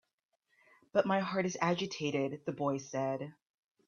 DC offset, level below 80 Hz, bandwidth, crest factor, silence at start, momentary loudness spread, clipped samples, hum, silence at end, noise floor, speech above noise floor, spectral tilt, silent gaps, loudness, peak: under 0.1%; -78 dBFS; 7.2 kHz; 22 dB; 0.95 s; 6 LU; under 0.1%; none; 0.55 s; -82 dBFS; 48 dB; -5.5 dB/octave; none; -34 LUFS; -14 dBFS